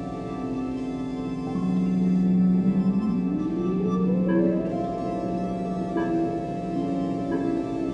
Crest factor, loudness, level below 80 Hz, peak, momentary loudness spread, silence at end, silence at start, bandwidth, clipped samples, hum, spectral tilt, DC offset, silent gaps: 14 dB; -25 LUFS; -48 dBFS; -12 dBFS; 8 LU; 0 s; 0 s; 7.2 kHz; under 0.1%; none; -9.5 dB/octave; under 0.1%; none